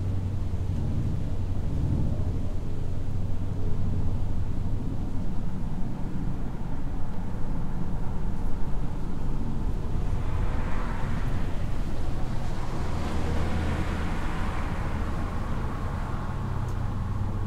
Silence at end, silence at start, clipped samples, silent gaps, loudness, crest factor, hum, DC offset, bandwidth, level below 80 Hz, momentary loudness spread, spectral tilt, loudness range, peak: 0 s; 0 s; under 0.1%; none; -32 LUFS; 12 dB; none; under 0.1%; 7.8 kHz; -30 dBFS; 5 LU; -7.5 dB/octave; 3 LU; -12 dBFS